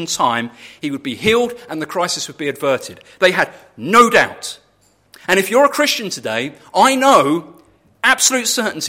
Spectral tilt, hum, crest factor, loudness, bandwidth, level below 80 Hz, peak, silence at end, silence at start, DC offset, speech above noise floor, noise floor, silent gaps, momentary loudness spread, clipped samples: -2.5 dB/octave; none; 16 dB; -15 LUFS; 16.5 kHz; -56 dBFS; 0 dBFS; 0 s; 0 s; under 0.1%; 40 dB; -57 dBFS; none; 14 LU; under 0.1%